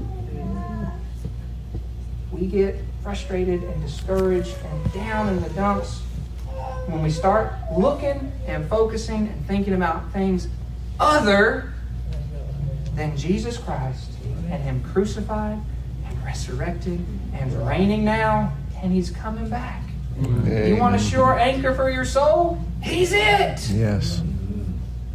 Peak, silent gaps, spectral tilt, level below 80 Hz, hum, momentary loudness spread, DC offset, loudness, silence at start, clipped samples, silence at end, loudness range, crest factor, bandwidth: -4 dBFS; none; -6.5 dB/octave; -30 dBFS; none; 14 LU; under 0.1%; -23 LUFS; 0 s; under 0.1%; 0 s; 7 LU; 18 dB; 15 kHz